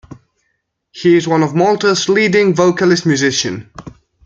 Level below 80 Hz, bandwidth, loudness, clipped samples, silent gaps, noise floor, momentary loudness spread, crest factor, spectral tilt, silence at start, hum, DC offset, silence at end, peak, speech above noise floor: -52 dBFS; 7.8 kHz; -13 LUFS; under 0.1%; none; -68 dBFS; 6 LU; 14 dB; -4.5 dB/octave; 0.1 s; none; under 0.1%; 0.35 s; -2 dBFS; 55 dB